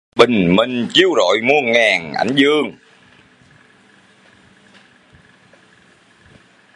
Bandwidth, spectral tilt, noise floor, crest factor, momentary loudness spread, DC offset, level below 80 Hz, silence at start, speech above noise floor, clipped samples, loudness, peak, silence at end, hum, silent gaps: 11 kHz; -4.5 dB/octave; -51 dBFS; 18 dB; 5 LU; under 0.1%; -54 dBFS; 0.15 s; 36 dB; under 0.1%; -14 LUFS; 0 dBFS; 4.05 s; none; none